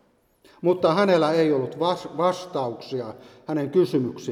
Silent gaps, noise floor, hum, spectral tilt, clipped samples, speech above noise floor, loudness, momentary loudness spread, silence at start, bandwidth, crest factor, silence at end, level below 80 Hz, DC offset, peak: none; -59 dBFS; none; -6.5 dB/octave; under 0.1%; 36 dB; -23 LUFS; 13 LU; 0.6 s; 13 kHz; 16 dB; 0 s; -70 dBFS; under 0.1%; -6 dBFS